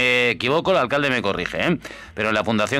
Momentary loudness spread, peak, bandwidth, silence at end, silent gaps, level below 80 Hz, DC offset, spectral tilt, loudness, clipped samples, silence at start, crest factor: 7 LU; -6 dBFS; 15.5 kHz; 0 s; none; -50 dBFS; under 0.1%; -5 dB/octave; -20 LUFS; under 0.1%; 0 s; 14 dB